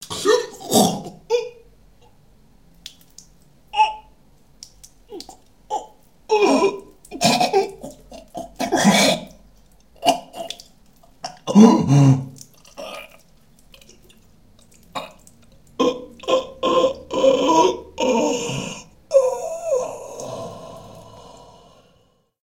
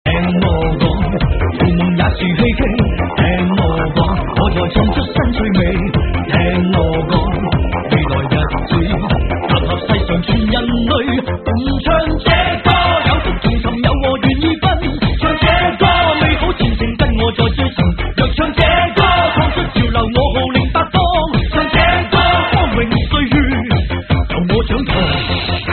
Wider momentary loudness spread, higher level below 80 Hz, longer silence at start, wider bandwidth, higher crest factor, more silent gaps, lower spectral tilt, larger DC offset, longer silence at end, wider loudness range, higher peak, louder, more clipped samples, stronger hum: first, 24 LU vs 4 LU; second, -54 dBFS vs -20 dBFS; about the same, 0 s vs 0.05 s; first, 17 kHz vs 4.5 kHz; first, 22 dB vs 14 dB; neither; about the same, -5 dB/octave vs -4.5 dB/octave; first, 0.2% vs under 0.1%; first, 1.25 s vs 0 s; first, 10 LU vs 2 LU; about the same, 0 dBFS vs 0 dBFS; second, -19 LUFS vs -14 LUFS; neither; neither